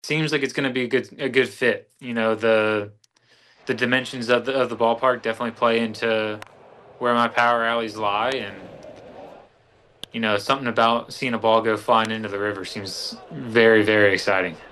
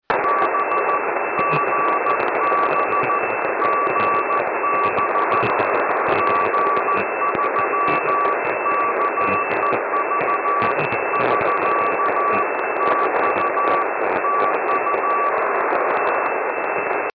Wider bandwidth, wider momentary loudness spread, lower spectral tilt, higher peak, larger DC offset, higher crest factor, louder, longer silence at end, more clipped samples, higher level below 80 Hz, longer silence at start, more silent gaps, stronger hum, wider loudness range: first, 12.5 kHz vs 5.2 kHz; first, 13 LU vs 2 LU; second, -4.5 dB/octave vs -8 dB/octave; first, -4 dBFS vs -10 dBFS; neither; first, 20 dB vs 10 dB; about the same, -21 LUFS vs -19 LUFS; about the same, 0.05 s vs 0.05 s; neither; about the same, -64 dBFS vs -60 dBFS; about the same, 0.05 s vs 0.1 s; neither; neither; first, 4 LU vs 1 LU